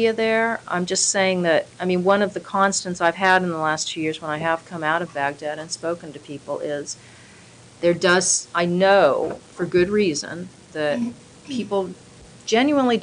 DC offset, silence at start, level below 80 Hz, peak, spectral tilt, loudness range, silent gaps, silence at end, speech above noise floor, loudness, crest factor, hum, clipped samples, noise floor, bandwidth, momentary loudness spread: under 0.1%; 0 s; -60 dBFS; -4 dBFS; -3.5 dB/octave; 6 LU; none; 0 s; 25 dB; -21 LUFS; 18 dB; none; under 0.1%; -47 dBFS; 10.5 kHz; 13 LU